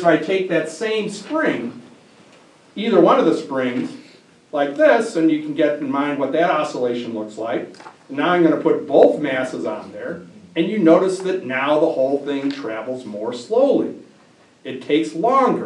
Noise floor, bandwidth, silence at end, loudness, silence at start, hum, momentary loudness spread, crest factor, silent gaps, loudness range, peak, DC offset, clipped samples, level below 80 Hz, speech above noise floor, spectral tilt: -51 dBFS; 10.5 kHz; 0 s; -19 LUFS; 0 s; none; 14 LU; 18 dB; none; 3 LU; 0 dBFS; under 0.1%; under 0.1%; -74 dBFS; 33 dB; -6 dB/octave